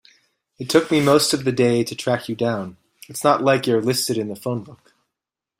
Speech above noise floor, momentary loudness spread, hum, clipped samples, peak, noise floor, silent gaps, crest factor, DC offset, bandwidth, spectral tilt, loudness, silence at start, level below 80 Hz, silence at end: 66 dB; 12 LU; none; under 0.1%; -2 dBFS; -85 dBFS; none; 18 dB; under 0.1%; 16 kHz; -4.5 dB/octave; -20 LUFS; 0.6 s; -60 dBFS; 0.85 s